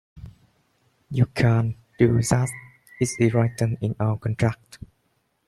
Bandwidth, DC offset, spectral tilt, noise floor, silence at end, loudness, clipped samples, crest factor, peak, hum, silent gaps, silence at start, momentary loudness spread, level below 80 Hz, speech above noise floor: 12.5 kHz; under 0.1%; -6.5 dB/octave; -70 dBFS; 0.7 s; -23 LUFS; under 0.1%; 20 dB; -4 dBFS; none; none; 0.15 s; 9 LU; -50 dBFS; 48 dB